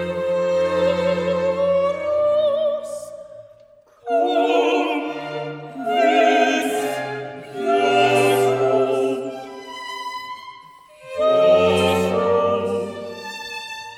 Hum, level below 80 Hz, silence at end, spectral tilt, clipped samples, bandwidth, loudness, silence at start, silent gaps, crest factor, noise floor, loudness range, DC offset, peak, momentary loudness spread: none; -60 dBFS; 0 s; -5 dB/octave; under 0.1%; 16 kHz; -19 LUFS; 0 s; none; 16 dB; -51 dBFS; 3 LU; under 0.1%; -4 dBFS; 16 LU